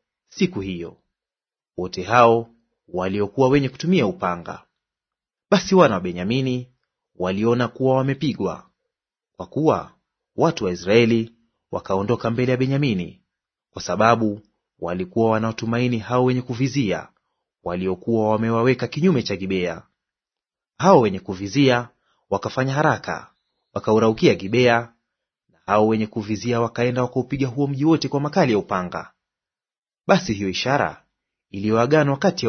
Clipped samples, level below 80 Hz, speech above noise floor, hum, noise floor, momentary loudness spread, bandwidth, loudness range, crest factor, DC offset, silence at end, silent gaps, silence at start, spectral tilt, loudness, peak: under 0.1%; -56 dBFS; over 70 dB; none; under -90 dBFS; 15 LU; 6.6 kHz; 3 LU; 22 dB; under 0.1%; 0 s; 29.78-29.82 s; 0.35 s; -6.5 dB/octave; -21 LUFS; 0 dBFS